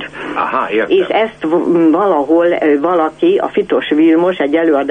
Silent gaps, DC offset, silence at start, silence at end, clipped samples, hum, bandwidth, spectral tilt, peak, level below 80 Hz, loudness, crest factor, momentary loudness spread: none; under 0.1%; 0 s; 0 s; under 0.1%; none; 3.9 kHz; -7 dB/octave; -2 dBFS; -52 dBFS; -13 LUFS; 10 dB; 5 LU